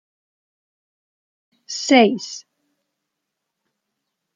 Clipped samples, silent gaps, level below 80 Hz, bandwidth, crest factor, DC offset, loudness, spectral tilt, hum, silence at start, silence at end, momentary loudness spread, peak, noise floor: under 0.1%; none; -76 dBFS; 9.2 kHz; 22 dB; under 0.1%; -17 LUFS; -3.5 dB/octave; none; 1.7 s; 1.95 s; 19 LU; -2 dBFS; -80 dBFS